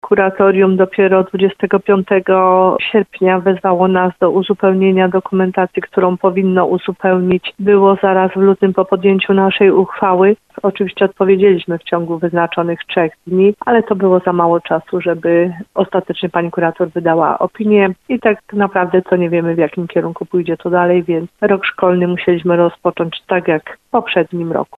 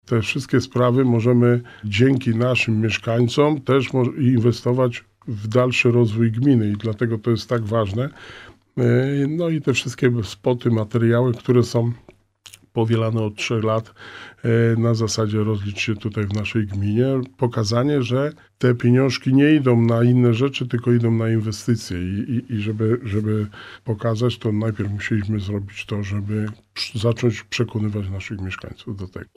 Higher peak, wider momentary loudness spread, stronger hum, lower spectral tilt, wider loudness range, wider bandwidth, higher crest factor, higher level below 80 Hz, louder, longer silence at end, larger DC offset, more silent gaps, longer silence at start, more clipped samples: first, 0 dBFS vs -4 dBFS; second, 7 LU vs 11 LU; neither; first, -9 dB/octave vs -7 dB/octave; second, 3 LU vs 6 LU; second, 4.1 kHz vs 11.5 kHz; about the same, 12 dB vs 16 dB; about the same, -54 dBFS vs -54 dBFS; first, -14 LUFS vs -20 LUFS; about the same, 0.15 s vs 0.1 s; neither; neither; about the same, 0.05 s vs 0.1 s; neither